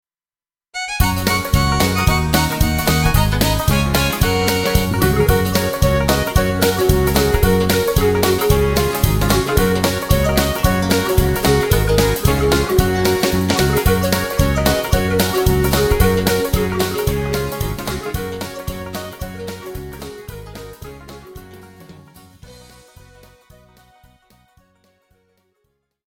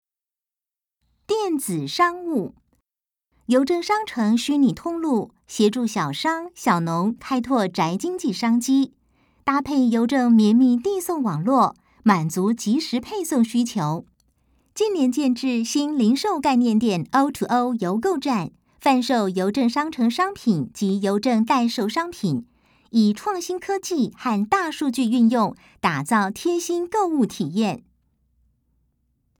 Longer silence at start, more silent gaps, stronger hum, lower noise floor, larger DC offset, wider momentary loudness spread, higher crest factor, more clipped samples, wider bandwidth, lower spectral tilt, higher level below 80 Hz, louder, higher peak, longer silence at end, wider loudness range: second, 0.75 s vs 1.3 s; neither; neither; about the same, under -90 dBFS vs -90 dBFS; neither; first, 14 LU vs 7 LU; about the same, 18 dB vs 18 dB; neither; about the same, 17.5 kHz vs 18.5 kHz; about the same, -5 dB/octave vs -5.5 dB/octave; first, -24 dBFS vs -62 dBFS; first, -16 LUFS vs -22 LUFS; first, 0 dBFS vs -4 dBFS; first, 3.55 s vs 1.6 s; first, 14 LU vs 4 LU